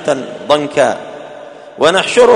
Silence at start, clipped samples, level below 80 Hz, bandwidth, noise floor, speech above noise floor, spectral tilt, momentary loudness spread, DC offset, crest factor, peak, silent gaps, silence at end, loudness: 0 s; 0.2%; -54 dBFS; 10.5 kHz; -32 dBFS; 21 dB; -3.5 dB/octave; 21 LU; under 0.1%; 12 dB; 0 dBFS; none; 0 s; -13 LUFS